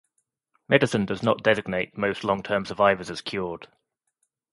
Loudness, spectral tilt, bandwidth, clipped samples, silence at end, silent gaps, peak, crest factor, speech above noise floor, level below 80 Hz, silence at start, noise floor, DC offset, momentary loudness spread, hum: -24 LUFS; -5.5 dB/octave; 11.5 kHz; under 0.1%; 0.85 s; none; -2 dBFS; 24 dB; 52 dB; -58 dBFS; 0.7 s; -76 dBFS; under 0.1%; 10 LU; none